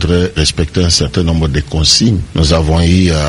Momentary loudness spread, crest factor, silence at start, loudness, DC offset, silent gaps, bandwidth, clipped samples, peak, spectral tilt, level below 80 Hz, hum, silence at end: 5 LU; 12 dB; 0 s; -11 LUFS; under 0.1%; none; 11.5 kHz; under 0.1%; 0 dBFS; -4.5 dB/octave; -20 dBFS; none; 0 s